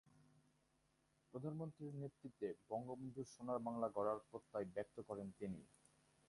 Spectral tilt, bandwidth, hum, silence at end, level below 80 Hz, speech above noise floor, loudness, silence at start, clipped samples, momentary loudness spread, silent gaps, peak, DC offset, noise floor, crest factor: -8 dB/octave; 11.5 kHz; none; 0.65 s; -80 dBFS; 33 dB; -49 LUFS; 0.15 s; under 0.1%; 8 LU; none; -28 dBFS; under 0.1%; -81 dBFS; 20 dB